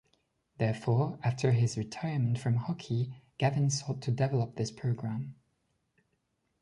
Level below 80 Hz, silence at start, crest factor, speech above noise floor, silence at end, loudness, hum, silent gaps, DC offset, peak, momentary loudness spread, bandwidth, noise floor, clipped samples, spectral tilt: -64 dBFS; 0.6 s; 18 dB; 48 dB; 1.3 s; -32 LUFS; none; none; under 0.1%; -14 dBFS; 7 LU; 11 kHz; -78 dBFS; under 0.1%; -6.5 dB/octave